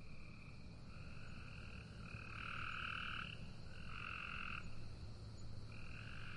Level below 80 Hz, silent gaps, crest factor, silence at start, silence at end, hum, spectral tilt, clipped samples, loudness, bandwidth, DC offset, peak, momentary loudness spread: -58 dBFS; none; 16 dB; 0 s; 0 s; none; -5 dB/octave; under 0.1%; -50 LUFS; 11 kHz; under 0.1%; -34 dBFS; 12 LU